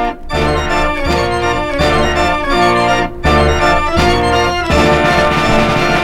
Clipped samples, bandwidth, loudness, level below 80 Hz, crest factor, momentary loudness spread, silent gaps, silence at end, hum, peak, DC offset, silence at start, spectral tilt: under 0.1%; 16 kHz; -12 LUFS; -22 dBFS; 12 dB; 4 LU; none; 0 s; none; 0 dBFS; under 0.1%; 0 s; -5 dB/octave